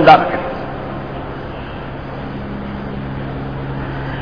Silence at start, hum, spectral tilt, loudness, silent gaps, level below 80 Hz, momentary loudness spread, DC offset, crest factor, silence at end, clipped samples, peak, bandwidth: 0 s; none; -8 dB/octave; -21 LUFS; none; -34 dBFS; 8 LU; 0.8%; 18 dB; 0 s; 0.2%; 0 dBFS; 5.4 kHz